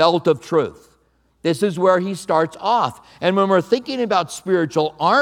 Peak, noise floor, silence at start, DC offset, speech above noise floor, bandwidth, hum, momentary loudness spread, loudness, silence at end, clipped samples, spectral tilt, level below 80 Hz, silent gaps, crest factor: 0 dBFS; -61 dBFS; 0 s; under 0.1%; 43 dB; 15.5 kHz; none; 6 LU; -19 LUFS; 0 s; under 0.1%; -5.5 dB/octave; -62 dBFS; none; 18 dB